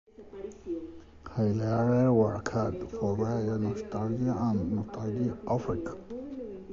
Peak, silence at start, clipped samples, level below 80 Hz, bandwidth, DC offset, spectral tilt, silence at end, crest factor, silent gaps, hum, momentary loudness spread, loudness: -12 dBFS; 0.2 s; under 0.1%; -52 dBFS; 7.6 kHz; under 0.1%; -8.5 dB/octave; 0 s; 18 dB; none; none; 16 LU; -30 LUFS